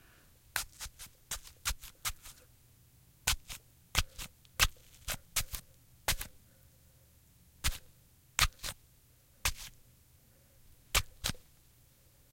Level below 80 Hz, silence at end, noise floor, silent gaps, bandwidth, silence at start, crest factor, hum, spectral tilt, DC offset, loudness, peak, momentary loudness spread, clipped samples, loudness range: -46 dBFS; 0.9 s; -64 dBFS; none; 17 kHz; 0.55 s; 32 dB; none; -1 dB/octave; under 0.1%; -36 LUFS; -8 dBFS; 17 LU; under 0.1%; 4 LU